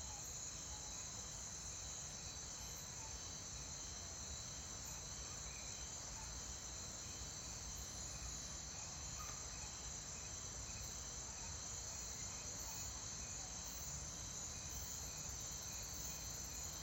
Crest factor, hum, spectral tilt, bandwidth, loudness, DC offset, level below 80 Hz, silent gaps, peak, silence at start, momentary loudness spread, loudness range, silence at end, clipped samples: 16 dB; none; -1.5 dB/octave; 16 kHz; -47 LUFS; under 0.1%; -58 dBFS; none; -34 dBFS; 0 s; 2 LU; 1 LU; 0 s; under 0.1%